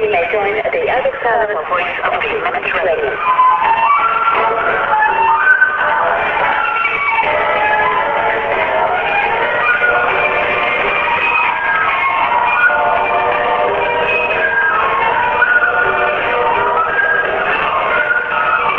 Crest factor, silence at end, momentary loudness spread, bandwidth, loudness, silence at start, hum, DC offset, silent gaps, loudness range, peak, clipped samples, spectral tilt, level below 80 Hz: 14 dB; 0 s; 4 LU; 7 kHz; -13 LUFS; 0 s; none; under 0.1%; none; 2 LU; 0 dBFS; under 0.1%; -5.5 dB/octave; -44 dBFS